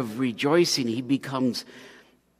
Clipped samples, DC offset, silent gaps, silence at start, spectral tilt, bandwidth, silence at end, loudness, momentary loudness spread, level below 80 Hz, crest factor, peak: under 0.1%; under 0.1%; none; 0 s; -4.5 dB/octave; 15.5 kHz; 0.45 s; -25 LUFS; 10 LU; -70 dBFS; 16 dB; -10 dBFS